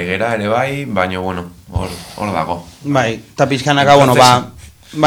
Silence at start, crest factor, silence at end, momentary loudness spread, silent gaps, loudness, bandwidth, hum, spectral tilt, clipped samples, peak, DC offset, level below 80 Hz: 0 s; 14 dB; 0 s; 16 LU; none; -14 LUFS; over 20 kHz; none; -5 dB/octave; 0.3%; 0 dBFS; under 0.1%; -38 dBFS